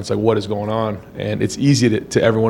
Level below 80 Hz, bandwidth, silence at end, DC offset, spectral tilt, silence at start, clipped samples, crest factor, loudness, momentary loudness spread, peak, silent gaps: -48 dBFS; 16.5 kHz; 0 s; under 0.1%; -6 dB/octave; 0 s; under 0.1%; 16 dB; -18 LUFS; 10 LU; 0 dBFS; none